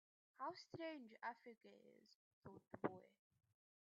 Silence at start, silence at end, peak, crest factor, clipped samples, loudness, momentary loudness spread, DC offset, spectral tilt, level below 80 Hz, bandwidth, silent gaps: 0.4 s; 0.75 s; -28 dBFS; 28 dB; under 0.1%; -53 LUFS; 16 LU; under 0.1%; -4 dB/octave; under -90 dBFS; 7 kHz; 2.15-2.42 s